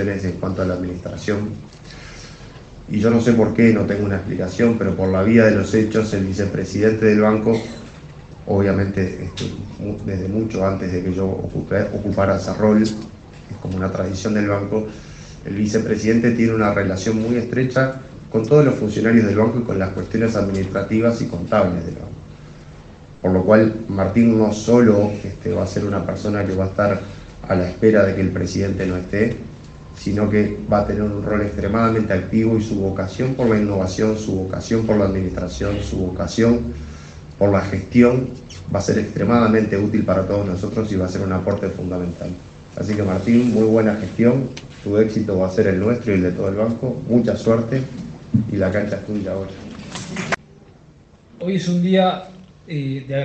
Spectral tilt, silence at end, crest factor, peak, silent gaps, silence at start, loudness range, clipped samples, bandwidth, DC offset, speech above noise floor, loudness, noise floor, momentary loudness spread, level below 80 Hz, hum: -7.5 dB/octave; 0 s; 18 dB; 0 dBFS; none; 0 s; 6 LU; under 0.1%; 8.4 kHz; under 0.1%; 30 dB; -19 LUFS; -48 dBFS; 15 LU; -42 dBFS; none